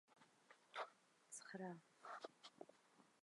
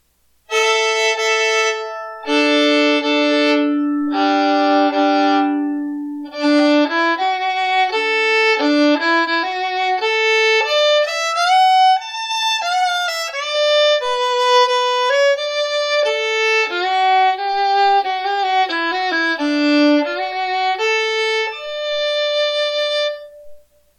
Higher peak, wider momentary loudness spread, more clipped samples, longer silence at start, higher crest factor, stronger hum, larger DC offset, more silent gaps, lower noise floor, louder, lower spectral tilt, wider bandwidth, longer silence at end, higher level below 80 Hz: second, -38 dBFS vs -6 dBFS; about the same, 9 LU vs 7 LU; neither; second, 0.1 s vs 0.5 s; first, 22 dB vs 10 dB; neither; neither; neither; first, -75 dBFS vs -54 dBFS; second, -57 LUFS vs -16 LUFS; first, -3.5 dB/octave vs -0.5 dB/octave; second, 11 kHz vs 13 kHz; second, 0.05 s vs 0.4 s; second, under -90 dBFS vs -66 dBFS